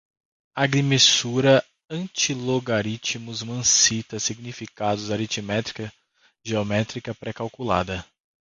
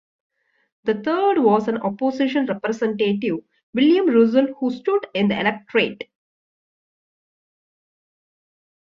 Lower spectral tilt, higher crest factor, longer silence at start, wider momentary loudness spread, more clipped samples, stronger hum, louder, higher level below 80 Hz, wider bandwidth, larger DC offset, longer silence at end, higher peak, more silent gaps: second, -3 dB/octave vs -7 dB/octave; about the same, 20 dB vs 18 dB; second, 0.55 s vs 0.85 s; first, 17 LU vs 10 LU; neither; neither; about the same, -22 LUFS vs -20 LUFS; first, -54 dBFS vs -66 dBFS; first, 10.5 kHz vs 7.4 kHz; neither; second, 0.4 s vs 2.9 s; about the same, -4 dBFS vs -4 dBFS; second, none vs 3.63-3.73 s